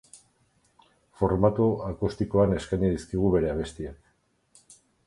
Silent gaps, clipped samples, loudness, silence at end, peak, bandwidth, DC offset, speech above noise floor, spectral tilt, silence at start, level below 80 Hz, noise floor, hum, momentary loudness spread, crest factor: none; under 0.1%; -26 LUFS; 0.35 s; -6 dBFS; 11.5 kHz; under 0.1%; 44 dB; -8 dB/octave; 0.15 s; -44 dBFS; -69 dBFS; none; 10 LU; 20 dB